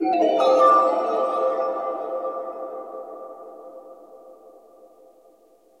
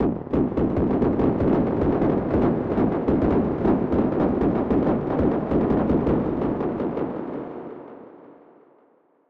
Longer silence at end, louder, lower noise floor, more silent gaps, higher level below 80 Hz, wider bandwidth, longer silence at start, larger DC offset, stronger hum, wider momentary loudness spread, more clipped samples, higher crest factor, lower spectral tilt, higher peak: first, 1.45 s vs 0.95 s; about the same, -21 LUFS vs -22 LUFS; second, -56 dBFS vs -60 dBFS; neither; second, -80 dBFS vs -38 dBFS; first, 10.5 kHz vs 5.4 kHz; about the same, 0 s vs 0 s; neither; neither; first, 25 LU vs 9 LU; neither; about the same, 18 dB vs 14 dB; second, -4.5 dB/octave vs -11 dB/octave; about the same, -6 dBFS vs -8 dBFS